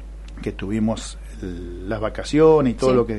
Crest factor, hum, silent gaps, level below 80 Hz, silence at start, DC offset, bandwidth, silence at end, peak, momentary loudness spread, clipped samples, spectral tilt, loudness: 16 dB; none; none; -34 dBFS; 0 s; under 0.1%; 11.5 kHz; 0 s; -4 dBFS; 18 LU; under 0.1%; -6.5 dB/octave; -20 LUFS